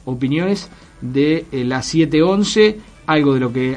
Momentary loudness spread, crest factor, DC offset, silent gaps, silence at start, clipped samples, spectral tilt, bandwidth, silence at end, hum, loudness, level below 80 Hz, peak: 10 LU; 16 dB; under 0.1%; none; 0.05 s; under 0.1%; -5.5 dB/octave; 10 kHz; 0 s; none; -17 LUFS; -46 dBFS; 0 dBFS